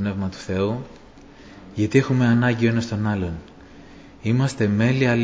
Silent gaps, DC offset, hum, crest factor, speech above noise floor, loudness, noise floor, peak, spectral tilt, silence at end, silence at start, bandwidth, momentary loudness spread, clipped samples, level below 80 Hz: none; under 0.1%; none; 18 dB; 24 dB; -21 LUFS; -45 dBFS; -4 dBFS; -7 dB/octave; 0 s; 0 s; 8 kHz; 13 LU; under 0.1%; -44 dBFS